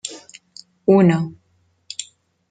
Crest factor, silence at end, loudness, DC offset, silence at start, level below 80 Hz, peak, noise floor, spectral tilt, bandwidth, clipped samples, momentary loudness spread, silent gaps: 18 dB; 0.5 s; -17 LUFS; under 0.1%; 0.05 s; -62 dBFS; -2 dBFS; -63 dBFS; -6.5 dB/octave; 9.4 kHz; under 0.1%; 26 LU; none